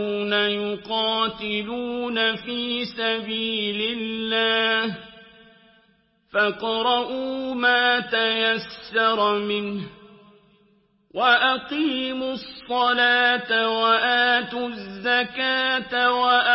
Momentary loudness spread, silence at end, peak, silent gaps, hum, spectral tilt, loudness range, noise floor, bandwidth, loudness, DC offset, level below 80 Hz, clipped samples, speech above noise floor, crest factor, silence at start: 10 LU; 0 s; -6 dBFS; none; none; -7.5 dB/octave; 4 LU; -63 dBFS; 5.8 kHz; -22 LUFS; under 0.1%; -62 dBFS; under 0.1%; 40 dB; 18 dB; 0 s